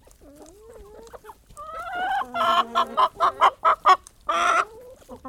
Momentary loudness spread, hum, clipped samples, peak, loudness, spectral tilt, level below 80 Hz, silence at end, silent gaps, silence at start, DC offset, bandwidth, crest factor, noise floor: 13 LU; none; under 0.1%; -4 dBFS; -22 LUFS; -2 dB/octave; -56 dBFS; 0 s; none; 0.4 s; under 0.1%; 16 kHz; 20 dB; -48 dBFS